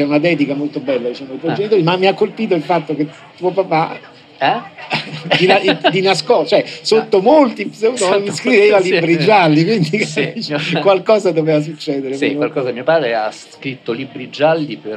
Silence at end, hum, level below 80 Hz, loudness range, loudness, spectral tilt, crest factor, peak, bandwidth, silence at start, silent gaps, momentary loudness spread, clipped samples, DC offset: 0 s; none; -68 dBFS; 5 LU; -15 LUFS; -5.5 dB/octave; 14 dB; 0 dBFS; 11 kHz; 0 s; none; 11 LU; under 0.1%; under 0.1%